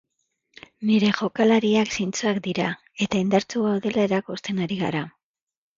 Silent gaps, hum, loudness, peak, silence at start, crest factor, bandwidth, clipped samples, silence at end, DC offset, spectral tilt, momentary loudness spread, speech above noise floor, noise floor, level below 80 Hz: none; none; -23 LUFS; -4 dBFS; 0.8 s; 18 dB; 7.6 kHz; under 0.1%; 0.7 s; under 0.1%; -5.5 dB/octave; 9 LU; 51 dB; -74 dBFS; -60 dBFS